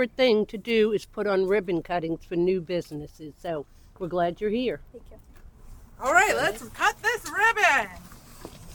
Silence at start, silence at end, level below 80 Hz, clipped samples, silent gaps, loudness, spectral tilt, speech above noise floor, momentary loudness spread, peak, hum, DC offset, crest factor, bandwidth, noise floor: 0 s; 0 s; -50 dBFS; under 0.1%; none; -25 LUFS; -4 dB/octave; 21 dB; 18 LU; -6 dBFS; none; under 0.1%; 20 dB; 19 kHz; -46 dBFS